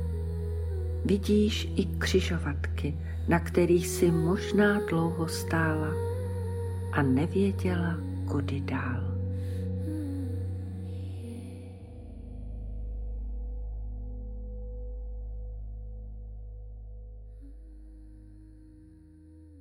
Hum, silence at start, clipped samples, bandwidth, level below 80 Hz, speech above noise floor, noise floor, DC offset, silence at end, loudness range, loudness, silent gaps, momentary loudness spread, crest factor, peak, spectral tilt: none; 0 s; under 0.1%; 16.5 kHz; -40 dBFS; 26 dB; -52 dBFS; under 0.1%; 0 s; 17 LU; -30 LUFS; none; 20 LU; 18 dB; -12 dBFS; -6.5 dB/octave